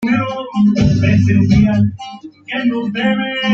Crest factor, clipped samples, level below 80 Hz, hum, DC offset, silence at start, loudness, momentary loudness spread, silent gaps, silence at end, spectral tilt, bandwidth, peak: 12 dB; under 0.1%; -34 dBFS; none; under 0.1%; 0 s; -14 LUFS; 12 LU; none; 0 s; -7.5 dB/octave; 7.2 kHz; -2 dBFS